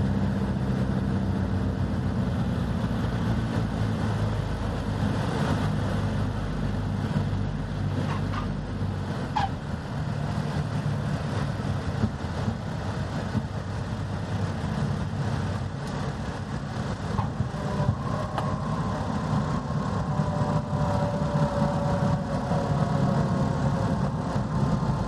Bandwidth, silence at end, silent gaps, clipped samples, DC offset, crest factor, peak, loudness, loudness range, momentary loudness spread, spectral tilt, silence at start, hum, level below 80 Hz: 12 kHz; 0 s; none; under 0.1%; under 0.1%; 16 dB; -12 dBFS; -28 LUFS; 4 LU; 5 LU; -7.5 dB/octave; 0 s; none; -38 dBFS